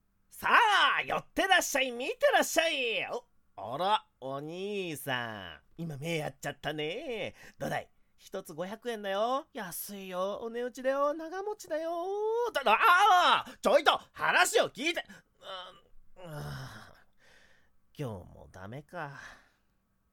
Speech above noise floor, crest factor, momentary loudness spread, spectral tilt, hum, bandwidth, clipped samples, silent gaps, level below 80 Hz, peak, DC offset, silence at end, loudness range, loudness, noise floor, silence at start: 42 dB; 24 dB; 19 LU; -2.5 dB/octave; none; 19 kHz; under 0.1%; none; -64 dBFS; -8 dBFS; under 0.1%; 0.8 s; 19 LU; -29 LUFS; -73 dBFS; 0.35 s